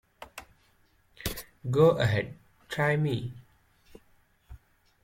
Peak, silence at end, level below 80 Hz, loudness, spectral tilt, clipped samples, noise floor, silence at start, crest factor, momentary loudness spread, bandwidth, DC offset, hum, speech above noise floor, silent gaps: -10 dBFS; 0.45 s; -54 dBFS; -28 LUFS; -6 dB/octave; under 0.1%; -65 dBFS; 0.2 s; 22 dB; 24 LU; 16.5 kHz; under 0.1%; none; 40 dB; none